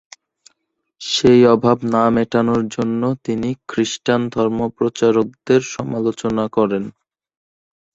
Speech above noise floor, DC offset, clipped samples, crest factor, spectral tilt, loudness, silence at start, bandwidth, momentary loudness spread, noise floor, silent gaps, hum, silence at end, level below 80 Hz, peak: 53 dB; under 0.1%; under 0.1%; 16 dB; -5.5 dB/octave; -17 LUFS; 1 s; 8 kHz; 9 LU; -70 dBFS; none; none; 1.05 s; -52 dBFS; -2 dBFS